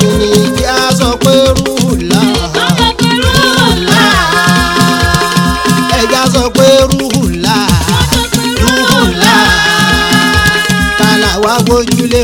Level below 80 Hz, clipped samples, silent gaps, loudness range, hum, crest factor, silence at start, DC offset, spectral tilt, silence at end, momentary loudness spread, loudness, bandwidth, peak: -22 dBFS; 2%; none; 1 LU; none; 8 dB; 0 s; under 0.1%; -4 dB/octave; 0 s; 4 LU; -8 LUFS; over 20 kHz; 0 dBFS